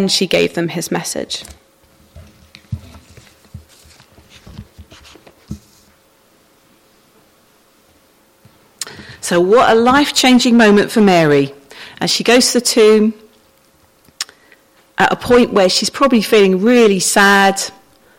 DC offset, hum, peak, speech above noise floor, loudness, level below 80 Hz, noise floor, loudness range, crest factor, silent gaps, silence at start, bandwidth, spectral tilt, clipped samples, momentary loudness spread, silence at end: under 0.1%; none; 0 dBFS; 41 dB; -12 LUFS; -48 dBFS; -52 dBFS; 14 LU; 14 dB; none; 0 s; 16.5 kHz; -3.5 dB/octave; under 0.1%; 19 LU; 0.5 s